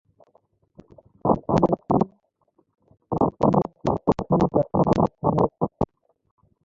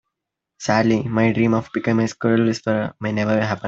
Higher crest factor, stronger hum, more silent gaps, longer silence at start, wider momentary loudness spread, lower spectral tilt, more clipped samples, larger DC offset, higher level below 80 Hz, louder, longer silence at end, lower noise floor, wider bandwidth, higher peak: about the same, 20 dB vs 18 dB; neither; neither; first, 1.25 s vs 0.6 s; about the same, 7 LU vs 5 LU; first, -9.5 dB/octave vs -6.5 dB/octave; neither; neither; first, -46 dBFS vs -54 dBFS; second, -23 LUFS vs -20 LUFS; first, 0.8 s vs 0 s; second, -67 dBFS vs -82 dBFS; about the same, 7.6 kHz vs 7.8 kHz; about the same, -4 dBFS vs -2 dBFS